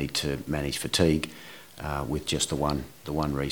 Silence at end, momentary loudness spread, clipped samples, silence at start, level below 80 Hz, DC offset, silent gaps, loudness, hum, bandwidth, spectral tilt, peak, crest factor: 0 s; 13 LU; under 0.1%; 0 s; -42 dBFS; 0.2%; none; -28 LUFS; none; over 20 kHz; -4.5 dB/octave; -6 dBFS; 22 dB